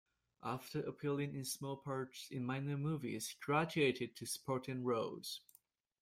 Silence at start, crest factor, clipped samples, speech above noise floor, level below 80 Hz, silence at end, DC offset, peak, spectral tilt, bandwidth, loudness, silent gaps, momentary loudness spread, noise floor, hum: 0.4 s; 20 dB; under 0.1%; 32 dB; -76 dBFS; 0.65 s; under 0.1%; -20 dBFS; -5 dB/octave; 16 kHz; -41 LUFS; none; 9 LU; -73 dBFS; none